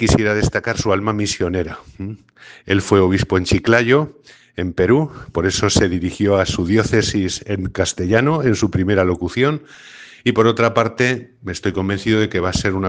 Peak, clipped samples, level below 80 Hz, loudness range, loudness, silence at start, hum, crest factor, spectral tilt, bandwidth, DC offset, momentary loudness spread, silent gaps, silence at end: 0 dBFS; under 0.1%; -38 dBFS; 2 LU; -17 LUFS; 0 s; none; 18 dB; -5 dB/octave; 10 kHz; under 0.1%; 12 LU; none; 0 s